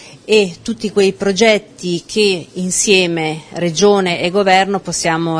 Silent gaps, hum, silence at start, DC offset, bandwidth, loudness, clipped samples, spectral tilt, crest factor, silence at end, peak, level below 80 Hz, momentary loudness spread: none; none; 0 s; under 0.1%; 10.5 kHz; -14 LUFS; under 0.1%; -3.5 dB/octave; 14 dB; 0 s; 0 dBFS; -50 dBFS; 9 LU